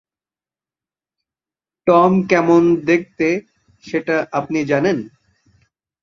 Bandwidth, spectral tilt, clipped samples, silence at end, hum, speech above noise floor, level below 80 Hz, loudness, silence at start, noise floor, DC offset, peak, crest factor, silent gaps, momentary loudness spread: 7.2 kHz; -7 dB/octave; under 0.1%; 0.95 s; none; over 74 dB; -58 dBFS; -17 LUFS; 1.85 s; under -90 dBFS; under 0.1%; 0 dBFS; 18 dB; none; 12 LU